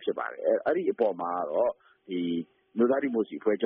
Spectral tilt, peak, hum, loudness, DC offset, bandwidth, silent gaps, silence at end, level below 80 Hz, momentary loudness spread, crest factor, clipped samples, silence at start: -2 dB/octave; -12 dBFS; none; -29 LUFS; under 0.1%; 3.9 kHz; none; 0 s; -74 dBFS; 9 LU; 16 dB; under 0.1%; 0 s